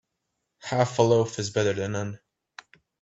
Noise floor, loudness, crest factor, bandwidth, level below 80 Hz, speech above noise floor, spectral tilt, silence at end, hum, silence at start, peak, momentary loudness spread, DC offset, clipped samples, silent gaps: -80 dBFS; -25 LUFS; 22 dB; 8.2 kHz; -64 dBFS; 56 dB; -5.5 dB/octave; 0.85 s; none; 0.65 s; -6 dBFS; 16 LU; under 0.1%; under 0.1%; none